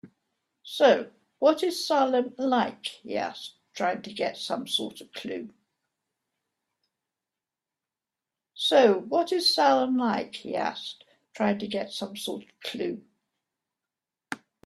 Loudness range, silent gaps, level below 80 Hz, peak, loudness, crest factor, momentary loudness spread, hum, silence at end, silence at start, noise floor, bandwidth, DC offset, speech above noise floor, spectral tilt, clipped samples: 11 LU; none; -76 dBFS; -6 dBFS; -26 LUFS; 22 dB; 17 LU; none; 0.3 s; 0.05 s; -90 dBFS; 14 kHz; under 0.1%; 63 dB; -4 dB/octave; under 0.1%